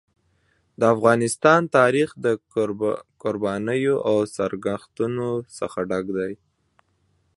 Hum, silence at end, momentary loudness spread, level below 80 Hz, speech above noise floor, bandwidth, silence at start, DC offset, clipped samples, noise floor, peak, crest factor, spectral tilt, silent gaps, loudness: none; 1 s; 11 LU; -60 dBFS; 45 dB; 11.5 kHz; 0.8 s; under 0.1%; under 0.1%; -67 dBFS; -2 dBFS; 22 dB; -5.5 dB/octave; none; -22 LUFS